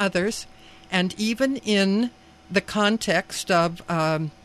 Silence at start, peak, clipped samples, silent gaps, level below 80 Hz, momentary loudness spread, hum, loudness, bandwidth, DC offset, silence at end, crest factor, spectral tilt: 0 s; -6 dBFS; under 0.1%; none; -54 dBFS; 6 LU; none; -23 LUFS; 14.5 kHz; under 0.1%; 0.15 s; 18 dB; -4.5 dB/octave